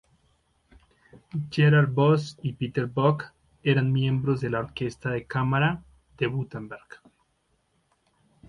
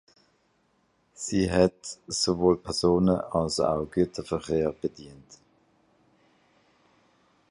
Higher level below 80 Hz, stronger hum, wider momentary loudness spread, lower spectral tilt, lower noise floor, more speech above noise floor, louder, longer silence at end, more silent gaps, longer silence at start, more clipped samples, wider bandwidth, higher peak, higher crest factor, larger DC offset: second, -58 dBFS vs -50 dBFS; neither; first, 16 LU vs 12 LU; first, -8 dB/octave vs -5 dB/octave; about the same, -71 dBFS vs -69 dBFS; about the same, 46 dB vs 43 dB; about the same, -25 LUFS vs -26 LUFS; second, 1.5 s vs 2.15 s; neither; about the same, 1.15 s vs 1.2 s; neither; second, 7.2 kHz vs 11.5 kHz; about the same, -8 dBFS vs -6 dBFS; about the same, 18 dB vs 22 dB; neither